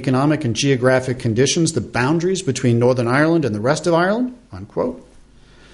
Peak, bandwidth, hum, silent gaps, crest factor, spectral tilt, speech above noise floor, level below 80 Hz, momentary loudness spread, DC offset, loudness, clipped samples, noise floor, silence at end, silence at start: -4 dBFS; 11.5 kHz; none; none; 14 dB; -5.5 dB/octave; 29 dB; -48 dBFS; 8 LU; under 0.1%; -18 LUFS; under 0.1%; -46 dBFS; 0.7 s; 0 s